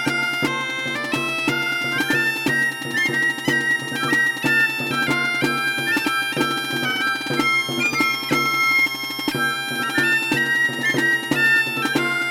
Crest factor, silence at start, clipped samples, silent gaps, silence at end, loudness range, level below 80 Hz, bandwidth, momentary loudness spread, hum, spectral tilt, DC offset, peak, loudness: 16 dB; 0 s; under 0.1%; none; 0 s; 1 LU; -62 dBFS; 20 kHz; 4 LU; none; -3 dB/octave; under 0.1%; -6 dBFS; -19 LUFS